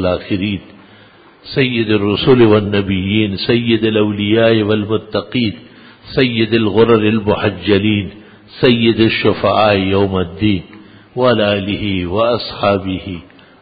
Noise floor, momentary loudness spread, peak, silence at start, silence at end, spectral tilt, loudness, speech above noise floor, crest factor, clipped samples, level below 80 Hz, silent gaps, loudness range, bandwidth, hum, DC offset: -43 dBFS; 10 LU; 0 dBFS; 0 s; 0.4 s; -10 dB/octave; -14 LUFS; 30 dB; 14 dB; under 0.1%; -38 dBFS; none; 2 LU; 5 kHz; none; under 0.1%